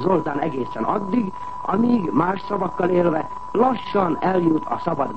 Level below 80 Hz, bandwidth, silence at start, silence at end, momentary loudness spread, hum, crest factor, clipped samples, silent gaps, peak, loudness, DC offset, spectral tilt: -52 dBFS; 8.4 kHz; 0 s; 0 s; 6 LU; none; 16 dB; under 0.1%; none; -6 dBFS; -22 LUFS; 1%; -8.5 dB/octave